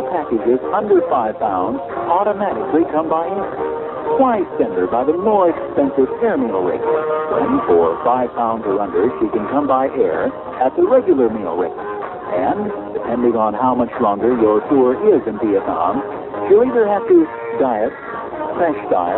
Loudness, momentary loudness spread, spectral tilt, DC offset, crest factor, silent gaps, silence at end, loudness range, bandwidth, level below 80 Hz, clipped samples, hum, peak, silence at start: -17 LUFS; 9 LU; -12 dB/octave; under 0.1%; 16 dB; none; 0 s; 2 LU; 4.1 kHz; -50 dBFS; under 0.1%; none; -2 dBFS; 0 s